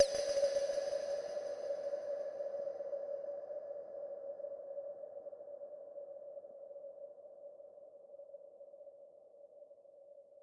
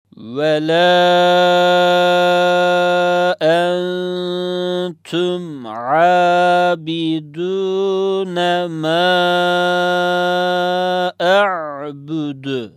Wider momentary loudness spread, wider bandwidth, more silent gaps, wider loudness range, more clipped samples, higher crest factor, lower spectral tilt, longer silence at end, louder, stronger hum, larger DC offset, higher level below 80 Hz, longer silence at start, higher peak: first, 22 LU vs 11 LU; second, 11.5 kHz vs 13 kHz; neither; first, 15 LU vs 4 LU; neither; first, 26 dB vs 14 dB; second, -1.5 dB/octave vs -5 dB/octave; about the same, 0 s vs 0.05 s; second, -42 LUFS vs -15 LUFS; neither; neither; second, -80 dBFS vs -72 dBFS; second, 0 s vs 0.2 s; second, -16 dBFS vs -2 dBFS